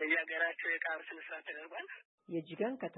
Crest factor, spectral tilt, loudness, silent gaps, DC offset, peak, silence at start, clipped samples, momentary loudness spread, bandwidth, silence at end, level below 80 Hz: 18 dB; -7.5 dB/octave; -38 LUFS; 2.05-2.18 s; under 0.1%; -20 dBFS; 0 s; under 0.1%; 13 LU; 4.1 kHz; 0 s; under -90 dBFS